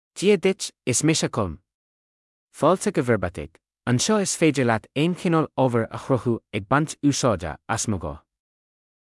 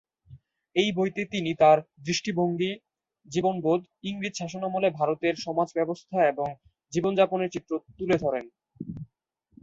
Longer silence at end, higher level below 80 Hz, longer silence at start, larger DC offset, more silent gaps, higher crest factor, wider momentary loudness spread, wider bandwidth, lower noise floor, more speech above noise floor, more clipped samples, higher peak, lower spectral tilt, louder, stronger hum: first, 0.95 s vs 0.55 s; first, -52 dBFS vs -64 dBFS; second, 0.15 s vs 0.3 s; neither; first, 1.74-2.47 s vs none; about the same, 18 dB vs 20 dB; about the same, 9 LU vs 11 LU; first, 12 kHz vs 8 kHz; first, under -90 dBFS vs -71 dBFS; first, over 68 dB vs 45 dB; neither; about the same, -6 dBFS vs -8 dBFS; about the same, -5 dB/octave vs -5.5 dB/octave; first, -23 LUFS vs -27 LUFS; neither